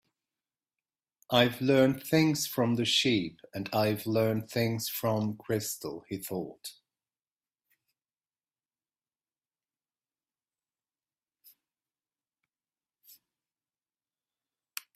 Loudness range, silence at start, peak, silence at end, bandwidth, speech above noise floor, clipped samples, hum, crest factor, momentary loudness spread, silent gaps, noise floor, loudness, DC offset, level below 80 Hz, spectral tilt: 16 LU; 1.3 s; -10 dBFS; 8.25 s; 16 kHz; over 61 dB; under 0.1%; none; 24 dB; 14 LU; none; under -90 dBFS; -29 LUFS; under 0.1%; -70 dBFS; -4.5 dB/octave